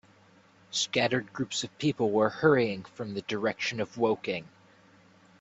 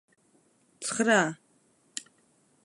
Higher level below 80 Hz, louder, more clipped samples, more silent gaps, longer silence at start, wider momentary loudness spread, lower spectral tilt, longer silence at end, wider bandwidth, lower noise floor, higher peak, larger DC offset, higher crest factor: first, -68 dBFS vs -84 dBFS; about the same, -29 LUFS vs -27 LUFS; neither; neither; about the same, 0.7 s vs 0.8 s; second, 11 LU vs 17 LU; about the same, -4.5 dB/octave vs -3.5 dB/octave; first, 0.95 s vs 0.65 s; second, 8.4 kHz vs 11.5 kHz; second, -60 dBFS vs -67 dBFS; about the same, -8 dBFS vs -10 dBFS; neither; about the same, 22 dB vs 22 dB